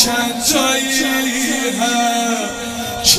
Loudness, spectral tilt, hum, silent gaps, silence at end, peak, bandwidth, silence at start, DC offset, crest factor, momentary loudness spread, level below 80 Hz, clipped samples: -16 LUFS; -1.5 dB/octave; none; none; 0 s; 0 dBFS; 16 kHz; 0 s; under 0.1%; 16 dB; 7 LU; -44 dBFS; under 0.1%